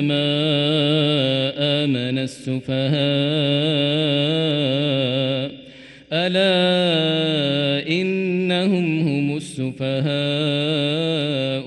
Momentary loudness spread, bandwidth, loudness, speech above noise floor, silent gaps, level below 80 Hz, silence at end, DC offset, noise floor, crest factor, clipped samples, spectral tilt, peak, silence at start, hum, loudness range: 7 LU; 11.5 kHz; -20 LUFS; 23 dB; none; -62 dBFS; 0 s; under 0.1%; -43 dBFS; 12 dB; under 0.1%; -6.5 dB/octave; -8 dBFS; 0 s; none; 2 LU